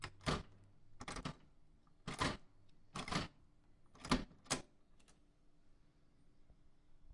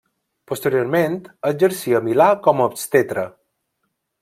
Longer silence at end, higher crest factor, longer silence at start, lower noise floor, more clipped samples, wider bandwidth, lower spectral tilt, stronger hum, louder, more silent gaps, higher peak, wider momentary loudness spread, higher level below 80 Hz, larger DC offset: second, 0 s vs 0.95 s; first, 28 dB vs 18 dB; second, 0 s vs 0.5 s; second, -68 dBFS vs -74 dBFS; neither; second, 11.5 kHz vs 16.5 kHz; second, -4 dB/octave vs -5.5 dB/octave; neither; second, -44 LUFS vs -18 LUFS; neither; second, -20 dBFS vs -2 dBFS; first, 14 LU vs 9 LU; first, -58 dBFS vs -64 dBFS; neither